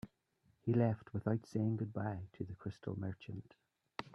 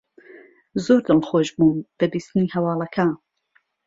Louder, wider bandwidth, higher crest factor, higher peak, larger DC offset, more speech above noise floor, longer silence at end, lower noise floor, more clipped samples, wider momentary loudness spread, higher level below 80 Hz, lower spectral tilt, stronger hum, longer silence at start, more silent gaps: second, -40 LUFS vs -21 LUFS; about the same, 7.6 kHz vs 7.8 kHz; about the same, 20 dB vs 18 dB; second, -20 dBFS vs -4 dBFS; neither; second, 38 dB vs 45 dB; second, 0.05 s vs 0.7 s; first, -76 dBFS vs -65 dBFS; neither; first, 16 LU vs 8 LU; second, -72 dBFS vs -60 dBFS; first, -9 dB/octave vs -7 dB/octave; neither; second, 0.05 s vs 0.75 s; neither